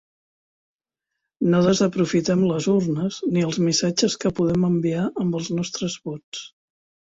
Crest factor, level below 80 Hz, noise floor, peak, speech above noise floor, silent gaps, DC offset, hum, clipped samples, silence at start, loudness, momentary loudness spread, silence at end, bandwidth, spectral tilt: 16 dB; -56 dBFS; -84 dBFS; -6 dBFS; 63 dB; 6.24-6.32 s; under 0.1%; none; under 0.1%; 1.4 s; -22 LUFS; 9 LU; 0.55 s; 8 kHz; -5.5 dB/octave